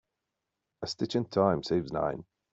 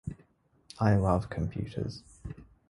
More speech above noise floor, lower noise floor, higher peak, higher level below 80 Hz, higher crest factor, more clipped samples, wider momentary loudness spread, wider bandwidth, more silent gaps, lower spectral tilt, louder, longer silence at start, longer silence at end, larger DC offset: first, 56 dB vs 36 dB; first, -86 dBFS vs -66 dBFS; about the same, -12 dBFS vs -10 dBFS; second, -62 dBFS vs -46 dBFS; about the same, 20 dB vs 22 dB; neither; second, 13 LU vs 20 LU; second, 8 kHz vs 11 kHz; neither; second, -6.5 dB/octave vs -8 dB/octave; about the same, -30 LUFS vs -30 LUFS; first, 0.8 s vs 0.05 s; about the same, 0.3 s vs 0.25 s; neither